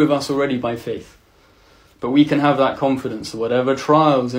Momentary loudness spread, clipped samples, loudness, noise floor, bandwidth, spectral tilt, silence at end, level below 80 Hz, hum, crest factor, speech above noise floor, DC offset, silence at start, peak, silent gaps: 13 LU; under 0.1%; -18 LUFS; -53 dBFS; 15.5 kHz; -6.5 dB/octave; 0 s; -54 dBFS; none; 16 dB; 35 dB; under 0.1%; 0 s; -2 dBFS; none